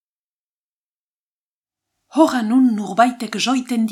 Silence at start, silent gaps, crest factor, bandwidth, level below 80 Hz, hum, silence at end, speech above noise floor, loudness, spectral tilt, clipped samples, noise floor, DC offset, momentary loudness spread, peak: 2.15 s; none; 18 dB; 13.5 kHz; -72 dBFS; none; 0 s; over 73 dB; -17 LUFS; -4.5 dB/octave; under 0.1%; under -90 dBFS; under 0.1%; 5 LU; -2 dBFS